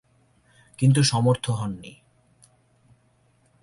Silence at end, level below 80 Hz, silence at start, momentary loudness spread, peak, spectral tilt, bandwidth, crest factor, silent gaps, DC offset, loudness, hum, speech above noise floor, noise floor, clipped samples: 1.7 s; -58 dBFS; 0.8 s; 18 LU; -10 dBFS; -5.5 dB/octave; 11.5 kHz; 18 dB; none; under 0.1%; -22 LUFS; none; 42 dB; -63 dBFS; under 0.1%